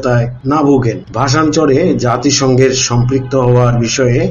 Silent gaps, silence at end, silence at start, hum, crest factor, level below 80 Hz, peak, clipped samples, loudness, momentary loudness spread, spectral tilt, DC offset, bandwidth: none; 0 s; 0 s; none; 10 dB; -34 dBFS; 0 dBFS; under 0.1%; -11 LUFS; 4 LU; -5.5 dB/octave; under 0.1%; 7.6 kHz